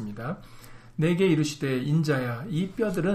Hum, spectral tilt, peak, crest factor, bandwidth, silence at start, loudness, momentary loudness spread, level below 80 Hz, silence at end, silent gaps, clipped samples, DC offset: none; -6.5 dB/octave; -12 dBFS; 14 dB; 15.5 kHz; 0 s; -27 LUFS; 13 LU; -54 dBFS; 0 s; none; under 0.1%; under 0.1%